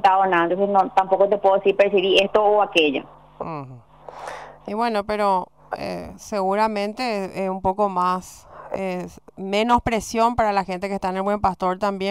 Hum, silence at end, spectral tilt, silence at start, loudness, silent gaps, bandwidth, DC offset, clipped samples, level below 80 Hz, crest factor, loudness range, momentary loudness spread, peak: none; 0 s; -5 dB/octave; 0 s; -21 LUFS; none; 15 kHz; 0.1%; under 0.1%; -48 dBFS; 16 dB; 6 LU; 17 LU; -6 dBFS